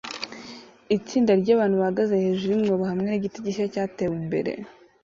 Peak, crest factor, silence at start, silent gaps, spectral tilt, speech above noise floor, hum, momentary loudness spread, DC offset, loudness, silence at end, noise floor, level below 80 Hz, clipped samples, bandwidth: -8 dBFS; 16 dB; 0.05 s; none; -7 dB/octave; 21 dB; none; 16 LU; under 0.1%; -24 LUFS; 0.35 s; -44 dBFS; -62 dBFS; under 0.1%; 7.6 kHz